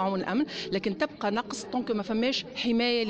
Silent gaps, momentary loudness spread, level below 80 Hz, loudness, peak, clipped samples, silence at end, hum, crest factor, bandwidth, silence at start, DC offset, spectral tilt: none; 5 LU; -60 dBFS; -29 LUFS; -16 dBFS; under 0.1%; 0 s; none; 14 dB; 8.8 kHz; 0 s; under 0.1%; -4.5 dB/octave